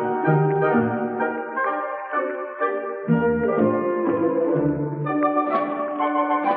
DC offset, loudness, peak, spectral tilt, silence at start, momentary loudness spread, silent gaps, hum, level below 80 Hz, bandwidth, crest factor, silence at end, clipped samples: under 0.1%; -22 LUFS; -6 dBFS; -7.5 dB/octave; 0 s; 6 LU; none; none; -58 dBFS; 4.2 kHz; 16 dB; 0 s; under 0.1%